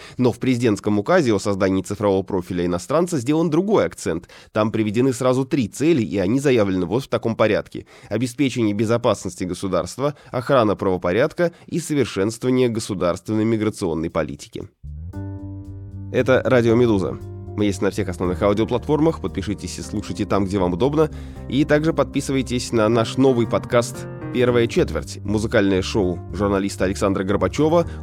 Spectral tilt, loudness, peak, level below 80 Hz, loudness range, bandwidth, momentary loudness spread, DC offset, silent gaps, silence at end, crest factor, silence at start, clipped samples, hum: -6 dB/octave; -20 LUFS; -4 dBFS; -42 dBFS; 3 LU; 15.5 kHz; 10 LU; under 0.1%; none; 0 s; 16 dB; 0 s; under 0.1%; none